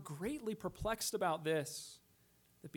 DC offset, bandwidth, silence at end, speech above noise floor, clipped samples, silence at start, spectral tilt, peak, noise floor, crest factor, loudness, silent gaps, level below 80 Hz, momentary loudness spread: under 0.1%; 19 kHz; 0.05 s; 31 dB; under 0.1%; 0 s; -4 dB/octave; -24 dBFS; -71 dBFS; 18 dB; -40 LUFS; none; -62 dBFS; 17 LU